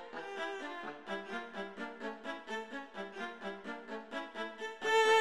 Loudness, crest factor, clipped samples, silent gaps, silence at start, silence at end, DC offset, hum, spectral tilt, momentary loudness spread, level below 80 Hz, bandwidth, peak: -39 LUFS; 20 dB; under 0.1%; none; 0 s; 0 s; under 0.1%; none; -2.5 dB/octave; 10 LU; -82 dBFS; 13.5 kHz; -18 dBFS